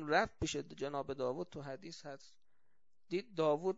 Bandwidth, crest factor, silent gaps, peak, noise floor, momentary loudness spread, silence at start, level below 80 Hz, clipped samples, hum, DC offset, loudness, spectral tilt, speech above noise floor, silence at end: 7.6 kHz; 22 dB; none; -18 dBFS; -86 dBFS; 15 LU; 0 s; -62 dBFS; under 0.1%; none; under 0.1%; -39 LUFS; -3.5 dB/octave; 47 dB; 0 s